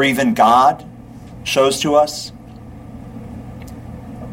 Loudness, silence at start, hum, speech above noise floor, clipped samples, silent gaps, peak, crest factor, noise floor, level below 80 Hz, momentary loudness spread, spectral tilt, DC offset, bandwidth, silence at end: -15 LUFS; 0 s; none; 22 dB; under 0.1%; none; -2 dBFS; 16 dB; -36 dBFS; -44 dBFS; 25 LU; -4 dB/octave; under 0.1%; 16.5 kHz; 0 s